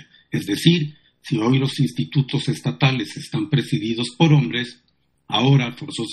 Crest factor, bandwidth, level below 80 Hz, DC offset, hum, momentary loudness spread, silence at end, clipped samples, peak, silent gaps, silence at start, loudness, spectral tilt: 20 dB; 12.5 kHz; -60 dBFS; under 0.1%; none; 11 LU; 0 s; under 0.1%; -2 dBFS; none; 0.3 s; -20 LUFS; -6 dB/octave